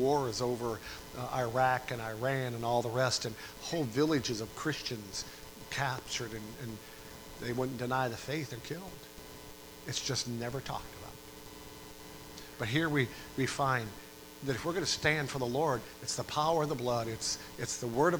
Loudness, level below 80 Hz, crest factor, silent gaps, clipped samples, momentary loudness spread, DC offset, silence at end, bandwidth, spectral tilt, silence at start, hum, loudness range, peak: -34 LUFS; -58 dBFS; 22 dB; none; under 0.1%; 18 LU; under 0.1%; 0 s; over 20 kHz; -4 dB/octave; 0 s; none; 6 LU; -12 dBFS